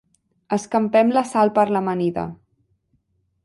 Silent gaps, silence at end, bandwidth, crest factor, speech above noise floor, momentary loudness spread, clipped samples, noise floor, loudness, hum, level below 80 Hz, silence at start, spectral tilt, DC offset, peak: none; 1.1 s; 11.5 kHz; 18 dB; 48 dB; 9 LU; under 0.1%; -67 dBFS; -20 LUFS; none; -60 dBFS; 0.5 s; -6.5 dB/octave; under 0.1%; -4 dBFS